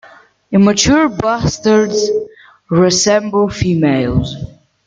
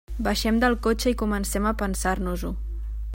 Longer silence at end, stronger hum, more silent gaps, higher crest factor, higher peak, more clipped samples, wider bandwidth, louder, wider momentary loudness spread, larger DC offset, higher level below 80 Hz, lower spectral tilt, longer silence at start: first, 0.4 s vs 0 s; neither; neither; about the same, 14 dB vs 18 dB; first, 0 dBFS vs -6 dBFS; neither; second, 9.4 kHz vs 16.5 kHz; first, -13 LUFS vs -25 LUFS; about the same, 10 LU vs 11 LU; neither; about the same, -36 dBFS vs -32 dBFS; about the same, -4.5 dB/octave vs -4.5 dB/octave; first, 0.5 s vs 0.1 s